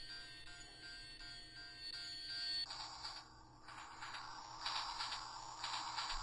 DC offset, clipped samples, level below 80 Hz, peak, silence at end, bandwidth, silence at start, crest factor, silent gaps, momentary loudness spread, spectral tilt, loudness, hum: under 0.1%; under 0.1%; -64 dBFS; -28 dBFS; 0 s; 11.5 kHz; 0 s; 20 dB; none; 12 LU; -0.5 dB/octave; -46 LUFS; none